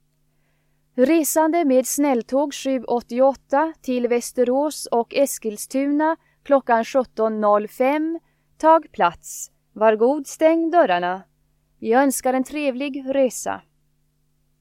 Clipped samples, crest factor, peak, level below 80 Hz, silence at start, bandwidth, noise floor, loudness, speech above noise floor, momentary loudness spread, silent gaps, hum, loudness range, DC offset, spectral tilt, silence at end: under 0.1%; 18 dB; -4 dBFS; -62 dBFS; 0.95 s; 16.5 kHz; -65 dBFS; -20 LUFS; 45 dB; 10 LU; none; none; 2 LU; under 0.1%; -3.5 dB/octave; 1 s